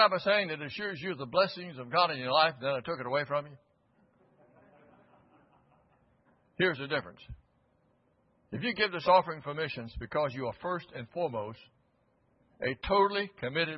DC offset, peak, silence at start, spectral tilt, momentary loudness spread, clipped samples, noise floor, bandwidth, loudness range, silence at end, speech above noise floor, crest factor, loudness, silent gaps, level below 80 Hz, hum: under 0.1%; -10 dBFS; 0 s; -2 dB/octave; 13 LU; under 0.1%; -71 dBFS; 5.8 kHz; 7 LU; 0 s; 40 dB; 24 dB; -31 LUFS; none; -58 dBFS; none